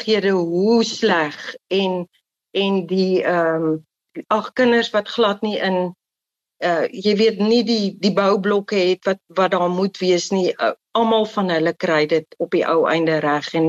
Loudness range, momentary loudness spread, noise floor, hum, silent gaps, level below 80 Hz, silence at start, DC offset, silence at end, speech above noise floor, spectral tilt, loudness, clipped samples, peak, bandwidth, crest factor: 2 LU; 6 LU; -86 dBFS; none; none; -68 dBFS; 0 s; under 0.1%; 0 s; 67 dB; -5.5 dB/octave; -19 LUFS; under 0.1%; -6 dBFS; 8 kHz; 12 dB